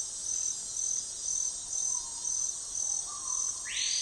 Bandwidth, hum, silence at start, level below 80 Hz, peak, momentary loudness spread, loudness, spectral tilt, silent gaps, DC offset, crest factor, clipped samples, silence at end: 11.5 kHz; none; 0 s; -64 dBFS; -20 dBFS; 2 LU; -31 LUFS; 2.5 dB/octave; none; under 0.1%; 14 dB; under 0.1%; 0 s